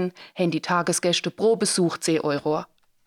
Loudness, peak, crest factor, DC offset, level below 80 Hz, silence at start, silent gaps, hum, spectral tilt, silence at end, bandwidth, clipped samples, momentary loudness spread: -23 LUFS; -10 dBFS; 14 dB; under 0.1%; -70 dBFS; 0 s; none; none; -4 dB/octave; 0.4 s; 16.5 kHz; under 0.1%; 6 LU